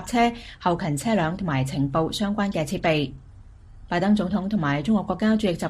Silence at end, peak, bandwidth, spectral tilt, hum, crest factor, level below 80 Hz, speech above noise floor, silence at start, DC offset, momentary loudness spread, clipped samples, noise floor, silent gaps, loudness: 0 s; -8 dBFS; 15 kHz; -6 dB/octave; none; 16 dB; -46 dBFS; 22 dB; 0 s; under 0.1%; 4 LU; under 0.1%; -46 dBFS; none; -24 LUFS